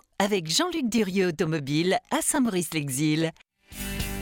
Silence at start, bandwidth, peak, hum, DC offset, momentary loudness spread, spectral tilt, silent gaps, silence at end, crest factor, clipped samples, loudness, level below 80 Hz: 0.2 s; 17.5 kHz; -8 dBFS; none; under 0.1%; 8 LU; -4 dB/octave; none; 0 s; 18 dB; under 0.1%; -26 LUFS; -46 dBFS